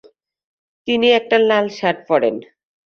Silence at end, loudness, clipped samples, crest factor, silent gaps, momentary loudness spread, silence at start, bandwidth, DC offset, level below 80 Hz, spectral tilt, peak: 0.45 s; -16 LUFS; under 0.1%; 18 dB; none; 9 LU; 0.85 s; 6.8 kHz; under 0.1%; -64 dBFS; -5 dB/octave; -2 dBFS